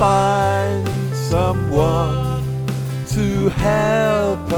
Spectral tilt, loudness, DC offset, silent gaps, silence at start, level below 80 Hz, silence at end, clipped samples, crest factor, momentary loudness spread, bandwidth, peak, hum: -6.5 dB/octave; -18 LUFS; under 0.1%; none; 0 s; -34 dBFS; 0 s; under 0.1%; 14 dB; 6 LU; 17.5 kHz; -4 dBFS; none